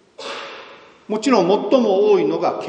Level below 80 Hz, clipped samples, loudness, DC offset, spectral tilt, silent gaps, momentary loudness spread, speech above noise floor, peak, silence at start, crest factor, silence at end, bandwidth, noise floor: -70 dBFS; under 0.1%; -17 LUFS; under 0.1%; -5.5 dB/octave; none; 16 LU; 26 dB; -2 dBFS; 0.2 s; 18 dB; 0 s; 9.6 kHz; -42 dBFS